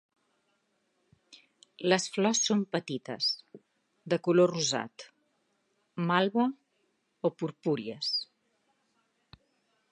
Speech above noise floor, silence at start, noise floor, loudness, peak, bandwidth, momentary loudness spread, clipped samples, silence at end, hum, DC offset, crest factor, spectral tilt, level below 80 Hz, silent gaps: 47 dB; 1.8 s; -76 dBFS; -29 LUFS; -8 dBFS; 11.5 kHz; 12 LU; under 0.1%; 1.65 s; none; under 0.1%; 24 dB; -4 dB/octave; -78 dBFS; none